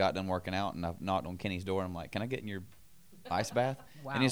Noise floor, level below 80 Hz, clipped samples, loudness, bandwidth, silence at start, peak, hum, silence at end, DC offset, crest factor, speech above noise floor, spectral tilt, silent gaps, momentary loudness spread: -55 dBFS; -64 dBFS; under 0.1%; -36 LUFS; over 20 kHz; 0 s; -14 dBFS; none; 0 s; 0.2%; 20 dB; 21 dB; -5.5 dB/octave; none; 12 LU